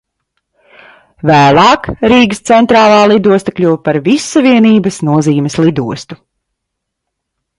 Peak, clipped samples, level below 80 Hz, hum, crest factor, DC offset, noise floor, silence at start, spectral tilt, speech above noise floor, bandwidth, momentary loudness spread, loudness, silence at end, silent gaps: 0 dBFS; under 0.1%; -44 dBFS; none; 10 dB; under 0.1%; -74 dBFS; 1.25 s; -5.5 dB/octave; 65 dB; 11.5 kHz; 7 LU; -9 LUFS; 1.45 s; none